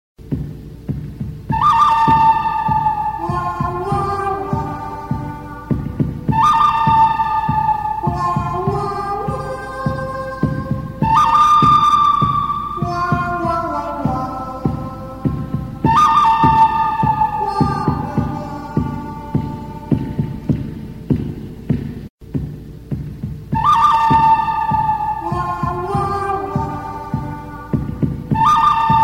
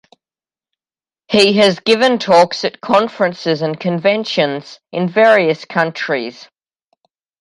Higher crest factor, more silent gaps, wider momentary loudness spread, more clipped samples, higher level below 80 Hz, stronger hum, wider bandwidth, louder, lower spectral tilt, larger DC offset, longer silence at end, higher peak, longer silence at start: about the same, 16 dB vs 16 dB; first, 22.10-22.18 s vs none; first, 15 LU vs 10 LU; neither; first, -34 dBFS vs -62 dBFS; neither; first, 16 kHz vs 11.5 kHz; second, -17 LUFS vs -14 LUFS; first, -7 dB/octave vs -5 dB/octave; first, 0.2% vs under 0.1%; second, 0 s vs 0.95 s; about the same, 0 dBFS vs 0 dBFS; second, 0.2 s vs 1.3 s